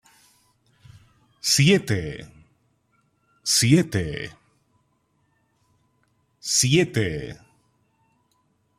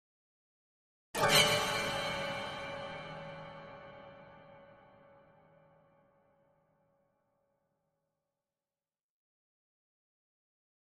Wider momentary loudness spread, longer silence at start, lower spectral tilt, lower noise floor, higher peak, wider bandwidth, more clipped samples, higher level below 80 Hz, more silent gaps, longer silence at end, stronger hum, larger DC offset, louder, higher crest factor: second, 18 LU vs 26 LU; first, 1.45 s vs 1.15 s; first, -4 dB/octave vs -2 dB/octave; second, -68 dBFS vs under -90 dBFS; first, -4 dBFS vs -12 dBFS; first, 15.5 kHz vs 13 kHz; neither; first, -54 dBFS vs -66 dBFS; neither; second, 1.45 s vs 6.3 s; neither; neither; first, -21 LUFS vs -32 LUFS; second, 22 dB vs 28 dB